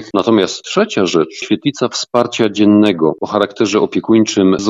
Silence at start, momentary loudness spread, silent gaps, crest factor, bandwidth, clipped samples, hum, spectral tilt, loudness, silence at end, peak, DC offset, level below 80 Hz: 0 s; 6 LU; none; 14 dB; 7.8 kHz; under 0.1%; none; -5 dB/octave; -14 LUFS; 0 s; 0 dBFS; under 0.1%; -56 dBFS